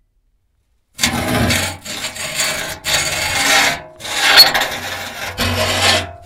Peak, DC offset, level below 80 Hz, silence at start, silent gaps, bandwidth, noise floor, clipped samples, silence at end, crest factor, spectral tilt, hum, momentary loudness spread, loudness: 0 dBFS; under 0.1%; -40 dBFS; 1 s; none; 18 kHz; -62 dBFS; 0.2%; 0 s; 18 dB; -1.5 dB/octave; none; 15 LU; -14 LUFS